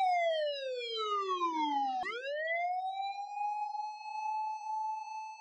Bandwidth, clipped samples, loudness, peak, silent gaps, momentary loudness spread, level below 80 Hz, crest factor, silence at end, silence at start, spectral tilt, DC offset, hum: 9.2 kHz; under 0.1%; -35 LUFS; -24 dBFS; none; 7 LU; -90 dBFS; 12 dB; 0 s; 0 s; -1 dB/octave; under 0.1%; none